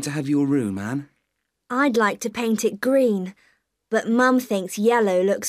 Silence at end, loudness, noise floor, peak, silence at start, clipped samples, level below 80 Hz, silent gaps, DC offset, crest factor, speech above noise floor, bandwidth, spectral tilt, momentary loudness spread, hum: 0 s; -21 LUFS; -77 dBFS; -4 dBFS; 0 s; under 0.1%; -68 dBFS; none; under 0.1%; 16 dB; 56 dB; 15.5 kHz; -5 dB/octave; 10 LU; none